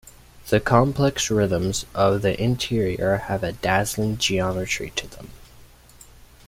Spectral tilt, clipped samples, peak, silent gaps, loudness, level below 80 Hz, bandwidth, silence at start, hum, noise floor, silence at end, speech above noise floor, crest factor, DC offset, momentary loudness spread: -5 dB/octave; under 0.1%; -2 dBFS; none; -22 LUFS; -44 dBFS; 16.5 kHz; 0.05 s; none; -48 dBFS; 0.85 s; 27 dB; 20 dB; under 0.1%; 8 LU